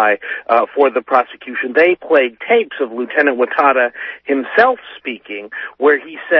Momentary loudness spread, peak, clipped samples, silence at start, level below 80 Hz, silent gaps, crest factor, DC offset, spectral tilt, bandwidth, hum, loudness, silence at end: 13 LU; 0 dBFS; under 0.1%; 0 s; -64 dBFS; none; 16 dB; under 0.1%; -6 dB/octave; 5.8 kHz; none; -15 LUFS; 0 s